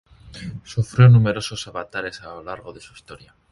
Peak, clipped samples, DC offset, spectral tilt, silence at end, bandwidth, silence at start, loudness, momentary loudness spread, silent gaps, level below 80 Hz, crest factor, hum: 0 dBFS; under 0.1%; under 0.1%; -6.5 dB/octave; 0.35 s; 11.5 kHz; 0.35 s; -18 LUFS; 23 LU; none; -48 dBFS; 20 dB; none